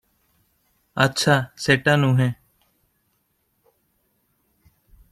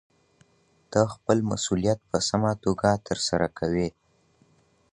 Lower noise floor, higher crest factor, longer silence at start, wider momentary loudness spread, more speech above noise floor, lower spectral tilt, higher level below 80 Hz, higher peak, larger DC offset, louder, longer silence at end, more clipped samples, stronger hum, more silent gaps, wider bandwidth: first, -70 dBFS vs -64 dBFS; about the same, 22 dB vs 22 dB; about the same, 0.95 s vs 0.9 s; first, 10 LU vs 3 LU; first, 51 dB vs 39 dB; about the same, -5 dB/octave vs -5 dB/octave; second, -58 dBFS vs -50 dBFS; about the same, -4 dBFS vs -6 dBFS; neither; first, -20 LUFS vs -26 LUFS; first, 2.8 s vs 1 s; neither; neither; neither; first, 14 kHz vs 11 kHz